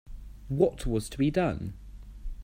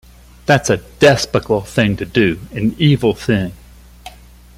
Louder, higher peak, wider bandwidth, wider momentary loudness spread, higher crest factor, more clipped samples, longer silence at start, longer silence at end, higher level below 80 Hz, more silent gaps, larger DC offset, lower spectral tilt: second, -29 LUFS vs -15 LUFS; second, -10 dBFS vs 0 dBFS; about the same, 16 kHz vs 16 kHz; first, 22 LU vs 7 LU; about the same, 20 dB vs 16 dB; neither; second, 0.05 s vs 0.5 s; second, 0 s vs 0.5 s; about the same, -40 dBFS vs -40 dBFS; neither; neither; first, -7 dB/octave vs -5.5 dB/octave